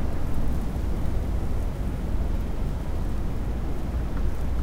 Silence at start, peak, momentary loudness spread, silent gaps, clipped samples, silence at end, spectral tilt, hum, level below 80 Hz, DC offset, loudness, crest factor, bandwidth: 0 s; -12 dBFS; 2 LU; none; under 0.1%; 0 s; -7.5 dB/octave; none; -28 dBFS; under 0.1%; -30 LUFS; 12 dB; 13 kHz